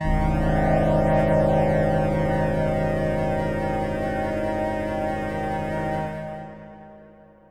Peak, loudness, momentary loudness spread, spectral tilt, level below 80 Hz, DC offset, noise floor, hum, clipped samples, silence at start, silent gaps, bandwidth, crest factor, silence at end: -10 dBFS; -23 LUFS; 10 LU; -8 dB/octave; -32 dBFS; under 0.1%; -49 dBFS; 50 Hz at -70 dBFS; under 0.1%; 0 s; none; 13.5 kHz; 14 dB; 0.45 s